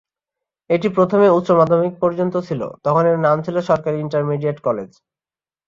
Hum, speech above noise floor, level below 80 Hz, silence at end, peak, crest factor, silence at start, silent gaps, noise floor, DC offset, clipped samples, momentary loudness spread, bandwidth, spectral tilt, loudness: none; over 73 dB; -58 dBFS; 0.8 s; -2 dBFS; 16 dB; 0.7 s; none; under -90 dBFS; under 0.1%; under 0.1%; 9 LU; 7.4 kHz; -8.5 dB/octave; -18 LUFS